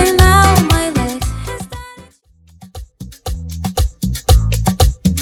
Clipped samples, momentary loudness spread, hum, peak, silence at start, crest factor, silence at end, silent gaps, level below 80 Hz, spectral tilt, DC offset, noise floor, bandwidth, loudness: under 0.1%; 23 LU; none; 0 dBFS; 0 s; 14 dB; 0 s; none; -20 dBFS; -5 dB/octave; under 0.1%; -48 dBFS; 19 kHz; -14 LUFS